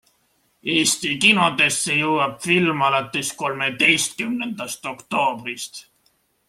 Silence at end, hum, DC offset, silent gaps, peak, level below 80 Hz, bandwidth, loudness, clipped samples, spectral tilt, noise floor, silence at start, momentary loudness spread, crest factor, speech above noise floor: 0.7 s; none; under 0.1%; none; -2 dBFS; -62 dBFS; 16 kHz; -19 LUFS; under 0.1%; -2.5 dB/octave; -65 dBFS; 0.65 s; 14 LU; 20 dB; 44 dB